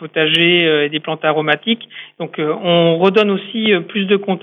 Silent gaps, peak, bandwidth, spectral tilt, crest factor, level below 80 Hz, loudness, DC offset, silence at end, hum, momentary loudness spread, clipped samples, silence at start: none; 0 dBFS; 9.6 kHz; -7 dB/octave; 14 dB; -68 dBFS; -15 LUFS; under 0.1%; 0.05 s; none; 10 LU; under 0.1%; 0 s